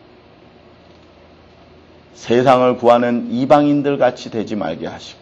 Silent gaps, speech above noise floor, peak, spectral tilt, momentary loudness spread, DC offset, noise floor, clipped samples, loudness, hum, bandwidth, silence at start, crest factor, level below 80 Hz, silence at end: none; 30 dB; 0 dBFS; -6.5 dB/octave; 13 LU; under 0.1%; -45 dBFS; under 0.1%; -15 LUFS; none; 8.6 kHz; 2.2 s; 18 dB; -56 dBFS; 0.1 s